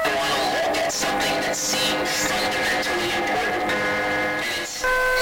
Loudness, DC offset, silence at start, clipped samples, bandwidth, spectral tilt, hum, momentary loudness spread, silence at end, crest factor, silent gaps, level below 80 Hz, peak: -22 LUFS; under 0.1%; 0 s; under 0.1%; 17 kHz; -2 dB/octave; none; 2 LU; 0 s; 12 dB; none; -46 dBFS; -10 dBFS